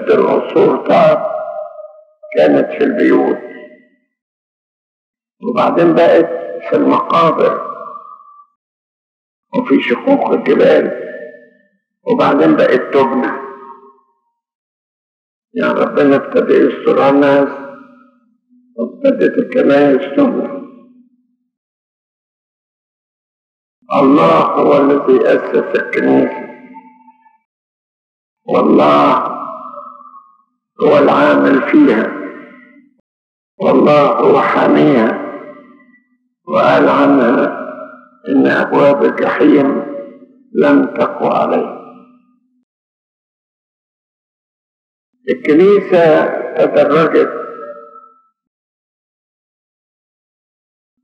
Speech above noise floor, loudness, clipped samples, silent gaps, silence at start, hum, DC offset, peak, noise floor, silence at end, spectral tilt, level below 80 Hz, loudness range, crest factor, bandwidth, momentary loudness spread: 54 dB; -12 LUFS; under 0.1%; 4.22-5.14 s, 8.55-9.43 s, 14.55-15.42 s, 21.57-23.82 s, 27.45-28.37 s, 33.00-33.58 s, 42.63-45.13 s; 0 s; none; under 0.1%; 0 dBFS; -64 dBFS; 3.05 s; -7.5 dB/octave; -72 dBFS; 5 LU; 14 dB; 7 kHz; 17 LU